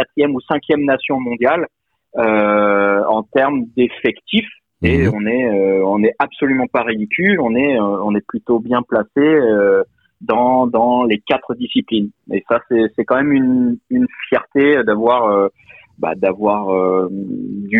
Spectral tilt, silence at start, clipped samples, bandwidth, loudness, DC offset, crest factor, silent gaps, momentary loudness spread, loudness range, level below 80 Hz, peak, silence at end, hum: -8.5 dB/octave; 0 s; under 0.1%; 4.6 kHz; -16 LUFS; under 0.1%; 14 dB; none; 7 LU; 1 LU; -44 dBFS; -2 dBFS; 0 s; none